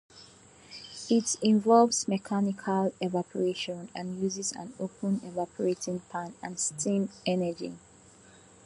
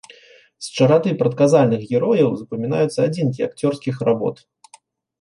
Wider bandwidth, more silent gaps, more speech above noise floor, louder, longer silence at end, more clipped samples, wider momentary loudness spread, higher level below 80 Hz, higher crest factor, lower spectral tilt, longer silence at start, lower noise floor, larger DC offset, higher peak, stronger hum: about the same, 11.5 kHz vs 11.5 kHz; neither; second, 27 dB vs 34 dB; second, -29 LUFS vs -19 LUFS; about the same, 0.9 s vs 0.85 s; neither; first, 14 LU vs 9 LU; second, -70 dBFS vs -64 dBFS; about the same, 22 dB vs 18 dB; second, -4.5 dB/octave vs -7 dB/octave; second, 0.15 s vs 0.6 s; first, -56 dBFS vs -52 dBFS; neither; second, -8 dBFS vs -2 dBFS; neither